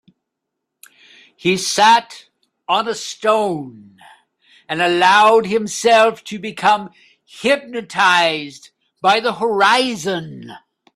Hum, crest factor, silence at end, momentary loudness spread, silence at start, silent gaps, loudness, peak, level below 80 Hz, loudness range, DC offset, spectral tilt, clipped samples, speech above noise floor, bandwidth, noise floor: none; 18 dB; 0.4 s; 16 LU; 1.45 s; none; -16 LUFS; 0 dBFS; -64 dBFS; 3 LU; under 0.1%; -3 dB/octave; under 0.1%; 62 dB; 14 kHz; -78 dBFS